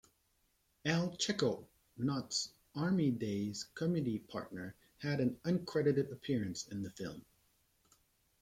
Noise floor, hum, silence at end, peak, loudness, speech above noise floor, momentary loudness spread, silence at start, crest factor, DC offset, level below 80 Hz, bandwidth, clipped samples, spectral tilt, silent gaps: -77 dBFS; none; 1.2 s; -18 dBFS; -37 LUFS; 40 dB; 12 LU; 0.85 s; 20 dB; under 0.1%; -70 dBFS; 16 kHz; under 0.1%; -5.5 dB/octave; none